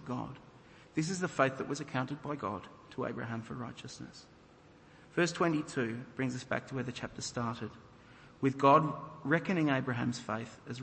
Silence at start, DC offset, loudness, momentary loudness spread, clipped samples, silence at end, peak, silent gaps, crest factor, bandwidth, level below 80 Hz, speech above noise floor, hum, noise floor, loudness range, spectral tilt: 0 s; under 0.1%; -34 LUFS; 15 LU; under 0.1%; 0 s; -12 dBFS; none; 24 dB; 8.4 kHz; -68 dBFS; 25 dB; none; -59 dBFS; 8 LU; -5.5 dB/octave